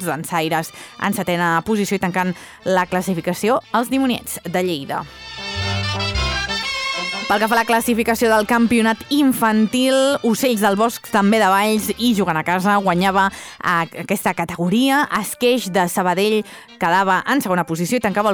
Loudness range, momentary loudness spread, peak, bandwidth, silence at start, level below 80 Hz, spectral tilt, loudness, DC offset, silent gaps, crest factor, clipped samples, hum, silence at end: 5 LU; 7 LU; -4 dBFS; over 20 kHz; 0 s; -42 dBFS; -4.5 dB/octave; -18 LUFS; under 0.1%; none; 14 dB; under 0.1%; none; 0 s